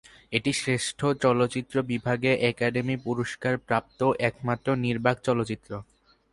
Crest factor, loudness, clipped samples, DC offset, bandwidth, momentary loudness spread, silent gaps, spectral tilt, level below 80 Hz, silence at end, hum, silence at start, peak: 20 dB; -26 LUFS; under 0.1%; under 0.1%; 11.5 kHz; 6 LU; none; -5.5 dB/octave; -58 dBFS; 0.5 s; none; 0.3 s; -6 dBFS